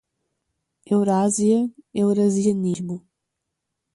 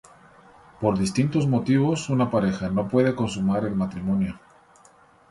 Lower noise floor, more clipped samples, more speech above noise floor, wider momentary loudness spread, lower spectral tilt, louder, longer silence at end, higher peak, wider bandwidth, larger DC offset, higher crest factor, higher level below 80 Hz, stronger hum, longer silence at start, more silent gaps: first, -80 dBFS vs -55 dBFS; neither; first, 60 dB vs 32 dB; first, 10 LU vs 5 LU; about the same, -6.5 dB/octave vs -7 dB/octave; first, -21 LUFS vs -24 LUFS; about the same, 0.95 s vs 0.95 s; about the same, -8 dBFS vs -8 dBFS; about the same, 11.5 kHz vs 11.5 kHz; neither; about the same, 14 dB vs 18 dB; second, -64 dBFS vs -52 dBFS; neither; about the same, 0.9 s vs 0.8 s; neither